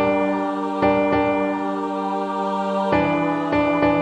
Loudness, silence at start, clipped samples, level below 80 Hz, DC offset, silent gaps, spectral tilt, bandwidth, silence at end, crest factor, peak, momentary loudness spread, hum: -21 LUFS; 0 s; under 0.1%; -50 dBFS; under 0.1%; none; -7.5 dB/octave; 8.8 kHz; 0 s; 14 dB; -6 dBFS; 6 LU; none